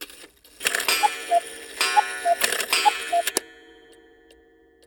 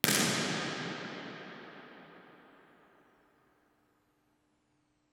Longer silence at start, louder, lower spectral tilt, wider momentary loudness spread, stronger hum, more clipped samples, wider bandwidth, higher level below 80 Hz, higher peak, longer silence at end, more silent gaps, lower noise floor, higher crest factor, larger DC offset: about the same, 0 s vs 0.05 s; first, -22 LUFS vs -33 LUFS; second, 1 dB/octave vs -2.5 dB/octave; second, 7 LU vs 25 LU; neither; neither; about the same, over 20 kHz vs over 20 kHz; first, -66 dBFS vs -76 dBFS; about the same, -2 dBFS vs 0 dBFS; second, 1.35 s vs 2.7 s; neither; second, -56 dBFS vs -75 dBFS; second, 24 dB vs 38 dB; neither